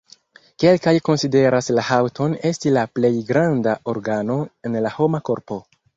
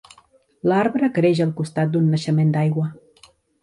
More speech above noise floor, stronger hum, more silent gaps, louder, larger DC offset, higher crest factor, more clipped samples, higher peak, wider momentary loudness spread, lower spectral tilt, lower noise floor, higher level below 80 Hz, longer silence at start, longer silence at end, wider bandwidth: second, 32 dB vs 37 dB; neither; neither; about the same, -19 LUFS vs -20 LUFS; neither; about the same, 16 dB vs 14 dB; neither; first, -2 dBFS vs -6 dBFS; about the same, 8 LU vs 6 LU; second, -6.5 dB/octave vs -8 dB/octave; second, -50 dBFS vs -56 dBFS; first, -58 dBFS vs -64 dBFS; about the same, 0.6 s vs 0.65 s; second, 0.35 s vs 0.65 s; second, 8 kHz vs 11 kHz